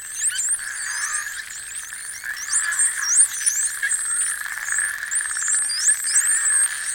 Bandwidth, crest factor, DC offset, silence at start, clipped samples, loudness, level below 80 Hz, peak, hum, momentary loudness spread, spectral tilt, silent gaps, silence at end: 17 kHz; 18 dB; under 0.1%; 0 s; under 0.1%; -19 LUFS; -62 dBFS; -6 dBFS; none; 13 LU; 4.5 dB/octave; none; 0 s